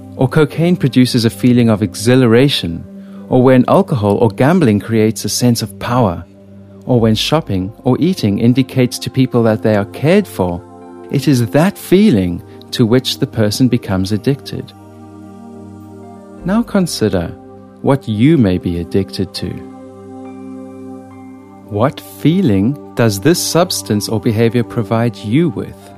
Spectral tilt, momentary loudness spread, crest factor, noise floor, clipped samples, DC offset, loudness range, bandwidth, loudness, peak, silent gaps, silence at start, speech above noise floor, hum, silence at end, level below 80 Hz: -6 dB/octave; 20 LU; 14 dB; -37 dBFS; under 0.1%; under 0.1%; 8 LU; 15.5 kHz; -14 LUFS; 0 dBFS; none; 0 s; 25 dB; none; 0 s; -44 dBFS